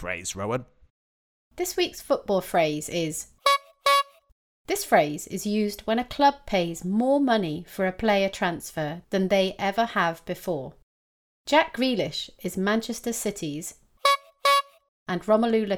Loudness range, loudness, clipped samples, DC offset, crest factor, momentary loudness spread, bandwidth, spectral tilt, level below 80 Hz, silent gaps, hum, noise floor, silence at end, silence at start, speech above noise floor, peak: 3 LU; -25 LUFS; under 0.1%; under 0.1%; 20 dB; 10 LU; 19.5 kHz; -4 dB/octave; -56 dBFS; 0.90-1.51 s, 4.32-4.65 s, 10.83-11.45 s, 14.88-15.06 s; none; under -90 dBFS; 0 s; 0 s; over 65 dB; -6 dBFS